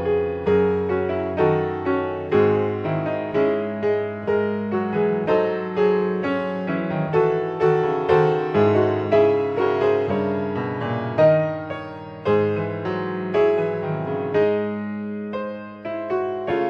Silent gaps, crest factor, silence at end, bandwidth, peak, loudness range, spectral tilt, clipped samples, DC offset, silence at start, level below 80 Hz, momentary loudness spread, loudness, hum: none; 16 dB; 0 s; 6.4 kHz; -4 dBFS; 4 LU; -9 dB/octave; under 0.1%; under 0.1%; 0 s; -56 dBFS; 9 LU; -22 LUFS; none